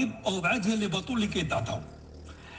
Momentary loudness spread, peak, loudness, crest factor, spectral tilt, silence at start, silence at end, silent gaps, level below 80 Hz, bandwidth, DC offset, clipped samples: 20 LU; -14 dBFS; -29 LUFS; 16 dB; -5 dB/octave; 0 s; 0 s; none; -52 dBFS; 9.8 kHz; under 0.1%; under 0.1%